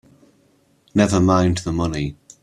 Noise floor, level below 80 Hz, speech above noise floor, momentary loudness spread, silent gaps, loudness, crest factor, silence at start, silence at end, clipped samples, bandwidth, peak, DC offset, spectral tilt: -59 dBFS; -42 dBFS; 41 dB; 10 LU; none; -19 LUFS; 18 dB; 0.95 s; 0.3 s; under 0.1%; 12 kHz; -2 dBFS; under 0.1%; -6 dB/octave